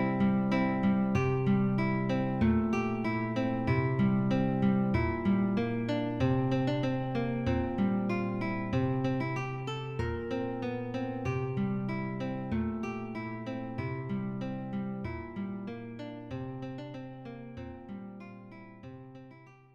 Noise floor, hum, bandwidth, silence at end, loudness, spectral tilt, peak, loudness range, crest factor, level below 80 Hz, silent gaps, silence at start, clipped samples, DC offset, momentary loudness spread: -54 dBFS; none; 7 kHz; 0.2 s; -32 LUFS; -8.5 dB/octave; -16 dBFS; 12 LU; 16 dB; -54 dBFS; none; 0 s; under 0.1%; under 0.1%; 16 LU